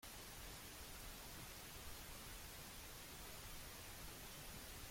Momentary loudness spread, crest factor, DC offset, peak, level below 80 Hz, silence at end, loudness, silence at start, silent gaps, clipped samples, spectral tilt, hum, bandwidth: 0 LU; 14 dB; under 0.1%; -40 dBFS; -62 dBFS; 0 s; -54 LUFS; 0 s; none; under 0.1%; -2.5 dB/octave; none; 16.5 kHz